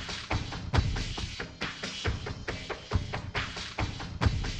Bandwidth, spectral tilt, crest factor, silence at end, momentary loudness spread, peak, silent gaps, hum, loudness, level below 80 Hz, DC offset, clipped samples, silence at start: 9.4 kHz; -4.5 dB/octave; 20 dB; 0 s; 7 LU; -12 dBFS; none; none; -34 LUFS; -38 dBFS; under 0.1%; under 0.1%; 0 s